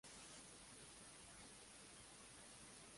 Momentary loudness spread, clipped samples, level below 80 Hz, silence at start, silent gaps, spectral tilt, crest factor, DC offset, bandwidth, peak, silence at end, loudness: 2 LU; under 0.1%; -76 dBFS; 0.05 s; none; -2 dB/octave; 14 dB; under 0.1%; 11.5 kHz; -48 dBFS; 0 s; -59 LUFS